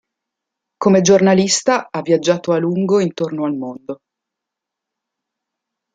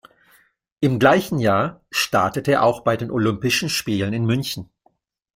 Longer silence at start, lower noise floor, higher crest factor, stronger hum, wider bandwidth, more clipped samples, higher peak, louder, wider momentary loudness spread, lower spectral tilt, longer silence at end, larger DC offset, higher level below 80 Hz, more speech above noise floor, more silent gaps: about the same, 0.8 s vs 0.8 s; first, -83 dBFS vs -64 dBFS; about the same, 16 dB vs 18 dB; neither; second, 9.4 kHz vs 16.5 kHz; neither; about the same, -2 dBFS vs -2 dBFS; first, -16 LUFS vs -20 LUFS; first, 16 LU vs 7 LU; about the same, -5 dB/octave vs -5 dB/octave; first, 2 s vs 0.7 s; neither; second, -60 dBFS vs -54 dBFS; first, 67 dB vs 44 dB; neither